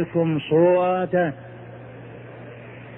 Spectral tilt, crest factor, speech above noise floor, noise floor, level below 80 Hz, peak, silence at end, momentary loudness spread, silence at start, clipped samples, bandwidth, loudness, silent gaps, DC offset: -11 dB/octave; 16 dB; 20 dB; -40 dBFS; -60 dBFS; -8 dBFS; 0 s; 22 LU; 0 s; under 0.1%; 3.8 kHz; -20 LUFS; none; under 0.1%